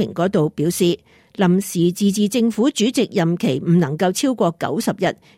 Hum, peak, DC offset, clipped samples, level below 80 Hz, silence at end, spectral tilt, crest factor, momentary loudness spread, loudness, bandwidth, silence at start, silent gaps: none; -6 dBFS; under 0.1%; under 0.1%; -60 dBFS; 0.25 s; -5.5 dB/octave; 12 dB; 4 LU; -19 LUFS; 16 kHz; 0 s; none